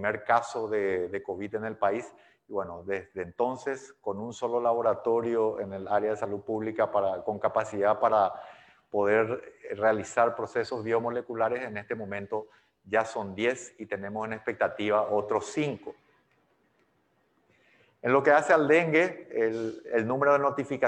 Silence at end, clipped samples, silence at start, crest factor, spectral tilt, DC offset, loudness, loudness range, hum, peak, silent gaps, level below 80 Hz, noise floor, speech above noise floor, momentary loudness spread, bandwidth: 0 s; under 0.1%; 0 s; 20 dB; -5.5 dB/octave; under 0.1%; -28 LUFS; 6 LU; none; -8 dBFS; none; -74 dBFS; -70 dBFS; 42 dB; 12 LU; 9.6 kHz